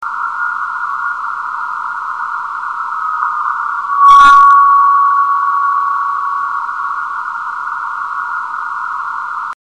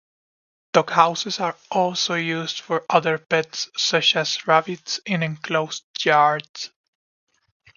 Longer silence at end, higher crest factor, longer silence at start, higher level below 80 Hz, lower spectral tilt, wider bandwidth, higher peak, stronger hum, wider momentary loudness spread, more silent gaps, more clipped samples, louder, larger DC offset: second, 0.1 s vs 1.1 s; second, 14 dB vs 22 dB; second, 0 s vs 0.75 s; first, -52 dBFS vs -70 dBFS; second, -0.5 dB/octave vs -3 dB/octave; first, 10.5 kHz vs 7.4 kHz; about the same, 0 dBFS vs 0 dBFS; neither; first, 14 LU vs 10 LU; second, none vs 5.84-5.94 s, 6.49-6.54 s; first, 0.3% vs under 0.1%; first, -13 LUFS vs -21 LUFS; first, 0.2% vs under 0.1%